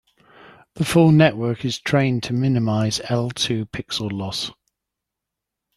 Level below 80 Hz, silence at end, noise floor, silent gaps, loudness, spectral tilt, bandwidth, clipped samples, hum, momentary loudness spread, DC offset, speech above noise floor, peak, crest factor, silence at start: -54 dBFS; 1.25 s; -84 dBFS; none; -20 LUFS; -5.5 dB/octave; 13 kHz; under 0.1%; none; 12 LU; under 0.1%; 64 dB; -2 dBFS; 20 dB; 0.75 s